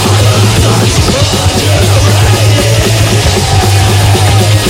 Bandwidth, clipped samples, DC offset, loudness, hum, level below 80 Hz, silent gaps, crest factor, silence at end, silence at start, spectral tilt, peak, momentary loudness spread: 16.5 kHz; under 0.1%; under 0.1%; -7 LUFS; none; -20 dBFS; none; 6 dB; 0 s; 0 s; -4.5 dB/octave; 0 dBFS; 1 LU